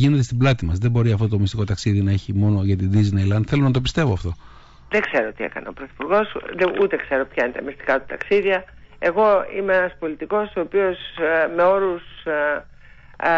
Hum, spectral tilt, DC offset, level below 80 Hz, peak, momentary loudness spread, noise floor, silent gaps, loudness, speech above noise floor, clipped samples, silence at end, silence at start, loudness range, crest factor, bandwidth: none; -7 dB/octave; under 0.1%; -42 dBFS; -6 dBFS; 9 LU; -41 dBFS; none; -21 LUFS; 22 dB; under 0.1%; 0 s; 0 s; 3 LU; 14 dB; 8 kHz